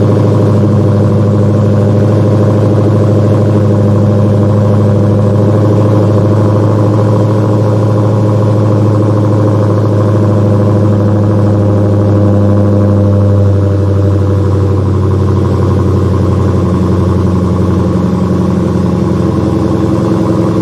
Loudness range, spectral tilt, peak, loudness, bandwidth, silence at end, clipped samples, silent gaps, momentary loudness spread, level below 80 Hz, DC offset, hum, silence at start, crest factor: 2 LU; -9.5 dB/octave; 0 dBFS; -9 LUFS; 8.2 kHz; 0 s; under 0.1%; none; 2 LU; -38 dBFS; under 0.1%; none; 0 s; 8 dB